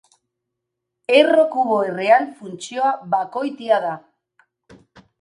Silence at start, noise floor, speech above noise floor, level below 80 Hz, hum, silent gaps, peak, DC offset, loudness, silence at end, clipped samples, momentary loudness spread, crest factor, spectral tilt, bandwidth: 1.1 s; -80 dBFS; 62 dB; -72 dBFS; none; none; 0 dBFS; under 0.1%; -18 LUFS; 1.2 s; under 0.1%; 15 LU; 20 dB; -4.5 dB/octave; 11 kHz